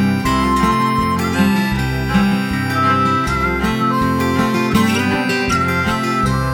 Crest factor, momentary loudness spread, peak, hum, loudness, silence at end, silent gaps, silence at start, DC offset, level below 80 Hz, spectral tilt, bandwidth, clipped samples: 14 dB; 3 LU; -2 dBFS; none; -16 LUFS; 0 s; none; 0 s; under 0.1%; -32 dBFS; -5.5 dB/octave; over 20 kHz; under 0.1%